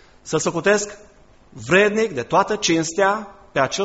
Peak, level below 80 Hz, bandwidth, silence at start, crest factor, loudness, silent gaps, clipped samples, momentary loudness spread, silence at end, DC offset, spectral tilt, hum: -2 dBFS; -54 dBFS; 8.2 kHz; 0.25 s; 18 dB; -19 LUFS; none; under 0.1%; 10 LU; 0 s; under 0.1%; -3.5 dB/octave; none